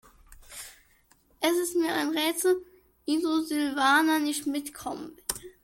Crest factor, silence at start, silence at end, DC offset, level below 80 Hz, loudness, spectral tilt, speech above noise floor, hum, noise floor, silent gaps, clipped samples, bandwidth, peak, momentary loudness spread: 20 dB; 0.3 s; 0.15 s; under 0.1%; -62 dBFS; -27 LUFS; -2 dB/octave; 37 dB; none; -63 dBFS; none; under 0.1%; 17 kHz; -8 dBFS; 19 LU